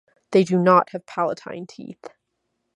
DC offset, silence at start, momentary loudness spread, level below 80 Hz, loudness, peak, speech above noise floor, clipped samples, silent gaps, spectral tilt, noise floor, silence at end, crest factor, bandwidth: under 0.1%; 0.3 s; 21 LU; -72 dBFS; -20 LUFS; -2 dBFS; 55 dB; under 0.1%; none; -7 dB/octave; -76 dBFS; 0.65 s; 20 dB; 10.5 kHz